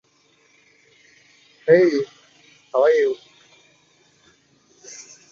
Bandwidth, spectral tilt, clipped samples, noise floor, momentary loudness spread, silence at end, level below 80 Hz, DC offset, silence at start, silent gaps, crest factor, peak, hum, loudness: 7.4 kHz; -5.5 dB/octave; under 0.1%; -60 dBFS; 24 LU; 0.3 s; -74 dBFS; under 0.1%; 1.65 s; none; 20 dB; -2 dBFS; none; -19 LUFS